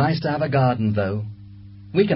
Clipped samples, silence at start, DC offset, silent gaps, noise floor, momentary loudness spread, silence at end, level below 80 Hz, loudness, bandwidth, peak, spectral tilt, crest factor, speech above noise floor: under 0.1%; 0 s; under 0.1%; none; -41 dBFS; 19 LU; 0 s; -48 dBFS; -22 LUFS; 5.8 kHz; -6 dBFS; -12 dB/octave; 16 dB; 20 dB